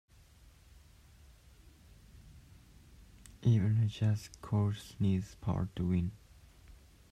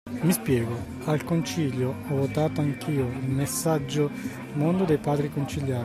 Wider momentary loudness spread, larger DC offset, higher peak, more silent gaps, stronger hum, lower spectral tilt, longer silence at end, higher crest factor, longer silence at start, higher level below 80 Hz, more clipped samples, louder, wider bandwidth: about the same, 7 LU vs 5 LU; neither; second, -18 dBFS vs -12 dBFS; neither; neither; first, -8 dB/octave vs -6 dB/octave; first, 0.35 s vs 0 s; about the same, 18 dB vs 14 dB; first, 2.15 s vs 0.05 s; about the same, -58 dBFS vs -54 dBFS; neither; second, -34 LUFS vs -27 LUFS; second, 11.5 kHz vs 15.5 kHz